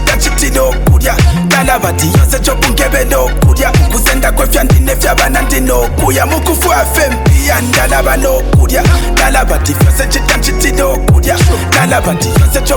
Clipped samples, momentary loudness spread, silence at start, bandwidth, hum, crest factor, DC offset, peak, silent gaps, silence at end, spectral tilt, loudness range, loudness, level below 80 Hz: under 0.1%; 2 LU; 0 s; 20 kHz; none; 8 dB; under 0.1%; 0 dBFS; none; 0 s; -4.5 dB/octave; 0 LU; -10 LUFS; -12 dBFS